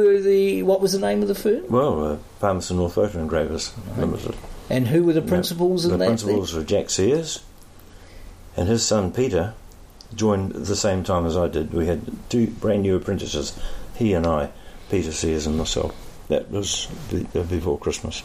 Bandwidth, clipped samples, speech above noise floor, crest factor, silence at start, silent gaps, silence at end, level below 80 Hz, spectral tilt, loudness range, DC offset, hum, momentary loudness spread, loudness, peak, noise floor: 15.5 kHz; under 0.1%; 22 dB; 16 dB; 0 s; none; 0 s; -38 dBFS; -5.5 dB/octave; 4 LU; under 0.1%; none; 9 LU; -22 LUFS; -6 dBFS; -44 dBFS